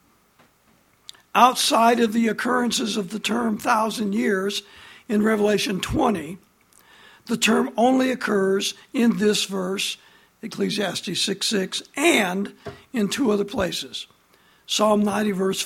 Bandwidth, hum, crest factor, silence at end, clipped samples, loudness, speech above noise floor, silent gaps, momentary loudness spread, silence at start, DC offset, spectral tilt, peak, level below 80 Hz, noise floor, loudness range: 16.5 kHz; none; 22 dB; 0 s; under 0.1%; -22 LUFS; 38 dB; none; 12 LU; 1.35 s; under 0.1%; -3.5 dB/octave; -2 dBFS; -52 dBFS; -60 dBFS; 3 LU